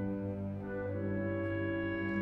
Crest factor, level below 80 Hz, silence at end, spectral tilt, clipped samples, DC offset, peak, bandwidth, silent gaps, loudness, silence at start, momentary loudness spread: 12 dB; -58 dBFS; 0 s; -10 dB/octave; under 0.1%; under 0.1%; -24 dBFS; 4.5 kHz; none; -37 LUFS; 0 s; 4 LU